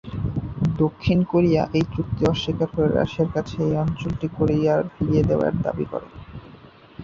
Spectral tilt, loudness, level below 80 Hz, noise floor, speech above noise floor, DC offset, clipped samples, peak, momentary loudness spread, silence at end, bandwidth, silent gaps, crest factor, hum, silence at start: -8 dB/octave; -22 LUFS; -40 dBFS; -46 dBFS; 25 dB; under 0.1%; under 0.1%; -6 dBFS; 9 LU; 0 s; 7.2 kHz; none; 16 dB; none; 0.05 s